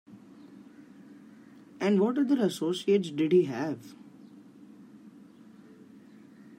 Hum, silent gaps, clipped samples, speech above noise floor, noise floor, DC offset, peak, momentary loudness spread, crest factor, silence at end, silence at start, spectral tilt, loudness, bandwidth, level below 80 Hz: none; none; under 0.1%; 26 dB; -53 dBFS; under 0.1%; -12 dBFS; 26 LU; 18 dB; 0.05 s; 0.1 s; -6.5 dB/octave; -27 LUFS; 16 kHz; -82 dBFS